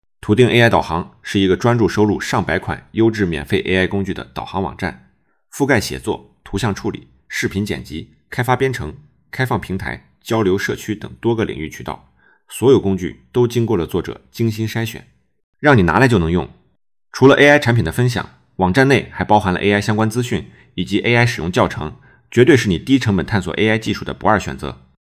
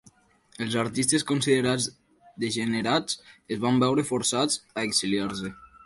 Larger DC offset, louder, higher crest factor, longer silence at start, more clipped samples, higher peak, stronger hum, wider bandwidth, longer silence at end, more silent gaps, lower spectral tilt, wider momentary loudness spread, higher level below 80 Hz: neither; first, -17 LUFS vs -26 LUFS; about the same, 16 dB vs 18 dB; second, 0.25 s vs 0.6 s; neither; first, 0 dBFS vs -10 dBFS; neither; first, 16 kHz vs 12 kHz; first, 0.35 s vs 0.2 s; first, 15.44-15.53 s vs none; first, -6 dB/octave vs -3.5 dB/octave; first, 15 LU vs 10 LU; first, -38 dBFS vs -62 dBFS